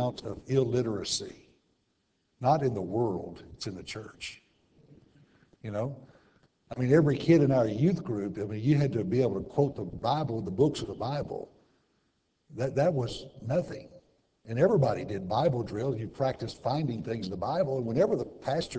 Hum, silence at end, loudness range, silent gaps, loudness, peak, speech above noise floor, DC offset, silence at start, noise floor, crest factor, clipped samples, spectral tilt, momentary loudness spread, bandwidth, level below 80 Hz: none; 0 s; 7 LU; none; -29 LUFS; -10 dBFS; 46 dB; under 0.1%; 0 s; -75 dBFS; 20 dB; under 0.1%; -7 dB/octave; 16 LU; 8 kHz; -58 dBFS